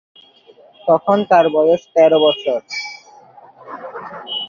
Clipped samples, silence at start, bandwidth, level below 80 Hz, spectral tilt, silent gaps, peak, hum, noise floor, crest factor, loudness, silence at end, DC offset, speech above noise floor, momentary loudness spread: under 0.1%; 0.85 s; 7.2 kHz; -66 dBFS; -5 dB/octave; none; -2 dBFS; none; -47 dBFS; 16 dB; -15 LUFS; 0 s; under 0.1%; 34 dB; 19 LU